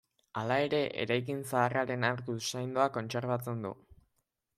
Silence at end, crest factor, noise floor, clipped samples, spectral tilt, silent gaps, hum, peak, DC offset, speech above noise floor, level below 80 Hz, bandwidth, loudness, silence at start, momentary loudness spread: 0.85 s; 20 dB; -80 dBFS; under 0.1%; -5 dB/octave; none; none; -14 dBFS; under 0.1%; 48 dB; -70 dBFS; 15.5 kHz; -33 LUFS; 0.35 s; 9 LU